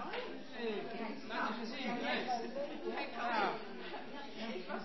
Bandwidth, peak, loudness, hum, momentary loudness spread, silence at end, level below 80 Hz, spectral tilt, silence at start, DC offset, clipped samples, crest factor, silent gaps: 6 kHz; -22 dBFS; -40 LUFS; none; 10 LU; 0 s; -74 dBFS; -2 dB/octave; 0 s; 0.3%; under 0.1%; 20 dB; none